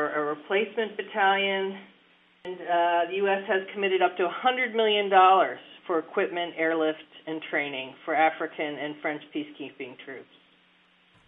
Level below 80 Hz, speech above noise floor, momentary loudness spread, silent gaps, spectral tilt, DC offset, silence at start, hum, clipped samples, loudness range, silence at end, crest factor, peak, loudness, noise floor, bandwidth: -86 dBFS; 36 dB; 17 LU; none; -7.5 dB/octave; under 0.1%; 0 s; none; under 0.1%; 7 LU; 1.05 s; 20 dB; -8 dBFS; -26 LUFS; -62 dBFS; 3.9 kHz